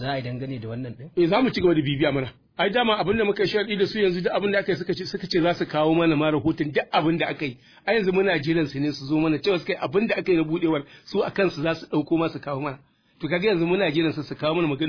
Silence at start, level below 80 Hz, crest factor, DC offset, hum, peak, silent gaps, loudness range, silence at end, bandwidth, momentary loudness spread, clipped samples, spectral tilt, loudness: 0 s; -54 dBFS; 16 dB; under 0.1%; none; -8 dBFS; none; 2 LU; 0 s; 5.4 kHz; 10 LU; under 0.1%; -7 dB/octave; -24 LUFS